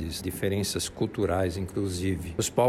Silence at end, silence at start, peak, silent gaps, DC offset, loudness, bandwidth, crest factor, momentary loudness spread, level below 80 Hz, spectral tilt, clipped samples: 0 s; 0 s; -10 dBFS; none; under 0.1%; -29 LUFS; 16 kHz; 18 dB; 4 LU; -46 dBFS; -5 dB/octave; under 0.1%